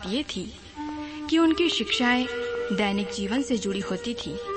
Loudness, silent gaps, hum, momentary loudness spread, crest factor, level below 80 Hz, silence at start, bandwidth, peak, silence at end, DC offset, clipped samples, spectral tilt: -26 LUFS; none; none; 13 LU; 16 dB; -52 dBFS; 0 s; 8.8 kHz; -10 dBFS; 0 s; under 0.1%; under 0.1%; -4 dB/octave